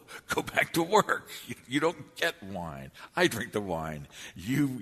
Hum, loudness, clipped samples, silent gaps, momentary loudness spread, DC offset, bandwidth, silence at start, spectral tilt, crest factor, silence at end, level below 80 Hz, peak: none; -30 LUFS; under 0.1%; none; 16 LU; under 0.1%; 13.5 kHz; 0.1 s; -4.5 dB/octave; 24 dB; 0 s; -60 dBFS; -6 dBFS